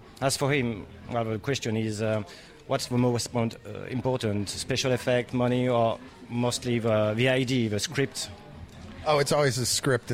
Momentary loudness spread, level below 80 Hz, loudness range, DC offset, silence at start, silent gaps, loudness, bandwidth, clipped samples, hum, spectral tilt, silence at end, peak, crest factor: 12 LU; -54 dBFS; 3 LU; under 0.1%; 0 s; none; -27 LUFS; 16.5 kHz; under 0.1%; none; -4.5 dB/octave; 0 s; -12 dBFS; 16 dB